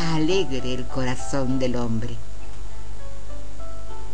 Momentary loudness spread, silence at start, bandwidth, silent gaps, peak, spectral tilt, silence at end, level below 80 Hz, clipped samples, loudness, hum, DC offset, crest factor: 17 LU; 0 s; 10.5 kHz; none; -8 dBFS; -5.5 dB/octave; 0 s; -38 dBFS; under 0.1%; -26 LUFS; 50 Hz at -40 dBFS; 10%; 16 dB